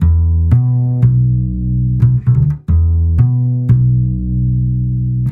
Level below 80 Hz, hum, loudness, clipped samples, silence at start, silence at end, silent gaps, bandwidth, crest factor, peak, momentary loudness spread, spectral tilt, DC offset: -20 dBFS; none; -14 LUFS; under 0.1%; 0 s; 0 s; none; 2.1 kHz; 12 dB; 0 dBFS; 5 LU; -12.5 dB/octave; under 0.1%